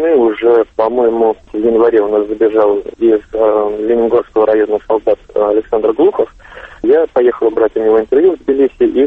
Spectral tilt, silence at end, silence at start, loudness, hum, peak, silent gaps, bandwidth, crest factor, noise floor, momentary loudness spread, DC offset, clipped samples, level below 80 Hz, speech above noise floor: -8 dB/octave; 0 s; 0 s; -12 LUFS; none; 0 dBFS; none; 3.9 kHz; 10 dB; -34 dBFS; 4 LU; under 0.1%; under 0.1%; -44 dBFS; 23 dB